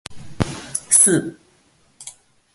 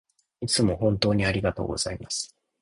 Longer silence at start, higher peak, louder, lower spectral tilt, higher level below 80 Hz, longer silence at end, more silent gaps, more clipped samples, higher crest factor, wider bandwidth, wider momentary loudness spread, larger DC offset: second, 0.1 s vs 0.4 s; first, 0 dBFS vs -6 dBFS; first, -16 LUFS vs -25 LUFS; second, -3 dB/octave vs -4.5 dB/octave; about the same, -46 dBFS vs -44 dBFS; about the same, 0.45 s vs 0.35 s; neither; neither; about the same, 22 dB vs 20 dB; about the same, 12 kHz vs 11 kHz; first, 26 LU vs 9 LU; neither